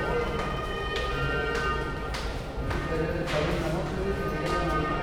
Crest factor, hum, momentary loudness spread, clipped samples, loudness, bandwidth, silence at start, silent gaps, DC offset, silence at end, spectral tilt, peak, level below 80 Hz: 14 dB; none; 5 LU; under 0.1%; -29 LUFS; 17 kHz; 0 s; none; under 0.1%; 0 s; -6 dB/octave; -14 dBFS; -36 dBFS